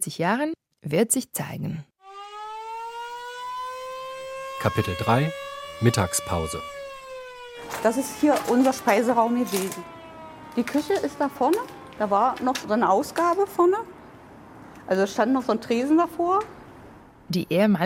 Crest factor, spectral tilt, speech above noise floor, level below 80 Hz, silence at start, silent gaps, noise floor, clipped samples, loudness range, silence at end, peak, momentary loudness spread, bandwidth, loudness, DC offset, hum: 20 dB; -5 dB/octave; 25 dB; -56 dBFS; 0 s; none; -47 dBFS; under 0.1%; 6 LU; 0 s; -6 dBFS; 17 LU; 16.5 kHz; -24 LUFS; under 0.1%; none